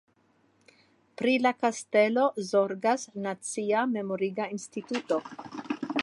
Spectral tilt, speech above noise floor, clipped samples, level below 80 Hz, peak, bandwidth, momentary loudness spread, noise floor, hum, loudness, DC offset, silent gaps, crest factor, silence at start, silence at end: -4.5 dB/octave; 39 dB; under 0.1%; -80 dBFS; -10 dBFS; 11.5 kHz; 10 LU; -67 dBFS; none; -28 LUFS; under 0.1%; none; 18 dB; 1.2 s; 0 s